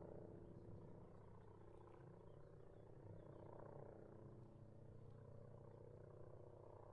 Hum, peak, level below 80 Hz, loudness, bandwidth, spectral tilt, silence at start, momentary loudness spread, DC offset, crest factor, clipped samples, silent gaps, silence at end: none; -44 dBFS; -72 dBFS; -62 LUFS; 4.6 kHz; -9.5 dB/octave; 0 s; 5 LU; under 0.1%; 16 dB; under 0.1%; none; 0 s